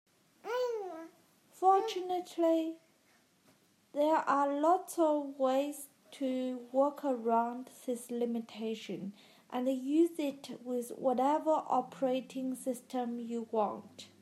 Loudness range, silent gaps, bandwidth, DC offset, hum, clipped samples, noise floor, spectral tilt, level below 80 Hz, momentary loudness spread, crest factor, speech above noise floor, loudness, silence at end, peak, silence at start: 3 LU; none; 15 kHz; under 0.1%; none; under 0.1%; -69 dBFS; -5 dB/octave; under -90 dBFS; 13 LU; 18 dB; 36 dB; -34 LUFS; 0.15 s; -16 dBFS; 0.45 s